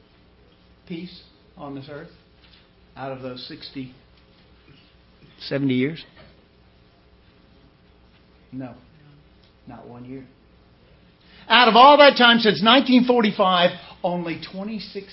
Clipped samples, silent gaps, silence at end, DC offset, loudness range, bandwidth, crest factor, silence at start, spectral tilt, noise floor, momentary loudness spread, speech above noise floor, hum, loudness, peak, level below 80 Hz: under 0.1%; none; 0.1 s; under 0.1%; 23 LU; 5.8 kHz; 22 dB; 0.9 s; -8.5 dB/octave; -55 dBFS; 28 LU; 35 dB; none; -16 LUFS; 0 dBFS; -58 dBFS